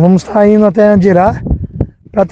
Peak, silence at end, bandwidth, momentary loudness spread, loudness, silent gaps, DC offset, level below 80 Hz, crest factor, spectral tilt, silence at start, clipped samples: 0 dBFS; 0.05 s; 8 kHz; 11 LU; -10 LUFS; none; under 0.1%; -26 dBFS; 10 dB; -9 dB/octave; 0 s; 1%